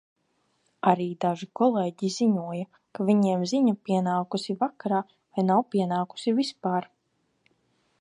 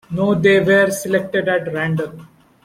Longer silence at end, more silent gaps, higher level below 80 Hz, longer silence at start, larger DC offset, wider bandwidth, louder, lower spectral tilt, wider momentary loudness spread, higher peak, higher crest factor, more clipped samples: first, 1.15 s vs 0.4 s; neither; second, -76 dBFS vs -54 dBFS; first, 0.85 s vs 0.1 s; neither; second, 10.5 kHz vs 16 kHz; second, -26 LUFS vs -16 LUFS; about the same, -6.5 dB/octave vs -5.5 dB/octave; about the same, 7 LU vs 9 LU; about the same, -4 dBFS vs -2 dBFS; first, 22 dB vs 16 dB; neither